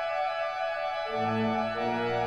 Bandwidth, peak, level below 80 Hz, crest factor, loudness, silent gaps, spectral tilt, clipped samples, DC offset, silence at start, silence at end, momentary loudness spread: 10.5 kHz; -16 dBFS; -62 dBFS; 12 dB; -30 LUFS; none; -6 dB/octave; under 0.1%; 0.1%; 0 s; 0 s; 3 LU